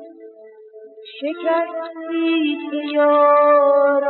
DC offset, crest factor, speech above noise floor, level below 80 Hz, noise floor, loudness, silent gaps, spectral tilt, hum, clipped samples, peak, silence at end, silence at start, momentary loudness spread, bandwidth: under 0.1%; 14 dB; 26 dB; -86 dBFS; -42 dBFS; -17 LUFS; none; 0.5 dB/octave; none; under 0.1%; -4 dBFS; 0 s; 0 s; 15 LU; 4.3 kHz